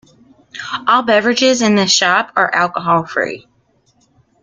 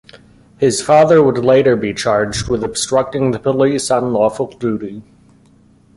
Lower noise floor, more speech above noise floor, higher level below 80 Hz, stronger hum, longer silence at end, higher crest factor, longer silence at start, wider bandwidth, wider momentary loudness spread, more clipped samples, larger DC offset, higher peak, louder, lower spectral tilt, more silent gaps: first, -58 dBFS vs -49 dBFS; first, 44 dB vs 35 dB; second, -60 dBFS vs -44 dBFS; neither; about the same, 1.05 s vs 0.95 s; about the same, 16 dB vs 14 dB; first, 0.55 s vs 0.15 s; second, 9.6 kHz vs 11.5 kHz; first, 13 LU vs 10 LU; neither; neither; about the same, 0 dBFS vs 0 dBFS; about the same, -14 LUFS vs -15 LUFS; second, -3 dB/octave vs -5 dB/octave; neither